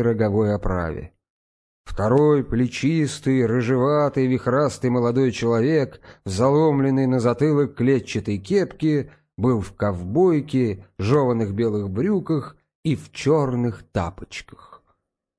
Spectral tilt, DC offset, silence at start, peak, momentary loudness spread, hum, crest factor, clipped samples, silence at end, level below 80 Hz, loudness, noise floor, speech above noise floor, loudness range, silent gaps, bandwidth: -7.5 dB/octave; under 0.1%; 0 s; -4 dBFS; 9 LU; none; 16 dB; under 0.1%; 0.65 s; -44 dBFS; -21 LUFS; -69 dBFS; 49 dB; 3 LU; 1.30-1.84 s, 12.75-12.83 s; 11 kHz